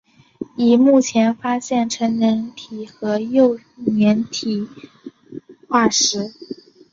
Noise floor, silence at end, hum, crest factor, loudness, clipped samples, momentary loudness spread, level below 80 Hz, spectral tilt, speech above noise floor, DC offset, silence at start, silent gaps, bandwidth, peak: -38 dBFS; 0.4 s; none; 16 dB; -18 LUFS; under 0.1%; 22 LU; -62 dBFS; -4 dB/octave; 21 dB; under 0.1%; 0.4 s; none; 7.6 kHz; -2 dBFS